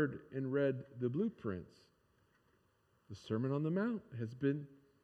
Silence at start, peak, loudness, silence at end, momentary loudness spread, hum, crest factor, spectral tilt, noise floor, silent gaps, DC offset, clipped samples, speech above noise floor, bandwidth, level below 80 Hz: 0 s; -22 dBFS; -39 LUFS; 0.3 s; 11 LU; none; 18 dB; -9 dB/octave; -75 dBFS; none; under 0.1%; under 0.1%; 37 dB; 9.2 kHz; -78 dBFS